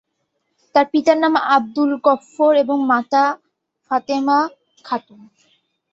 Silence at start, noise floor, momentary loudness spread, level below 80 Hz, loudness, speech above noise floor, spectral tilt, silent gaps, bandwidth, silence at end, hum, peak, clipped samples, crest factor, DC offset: 0.75 s; -72 dBFS; 11 LU; -66 dBFS; -17 LUFS; 55 dB; -4.5 dB/octave; none; 7.8 kHz; 0.95 s; none; -2 dBFS; under 0.1%; 16 dB; under 0.1%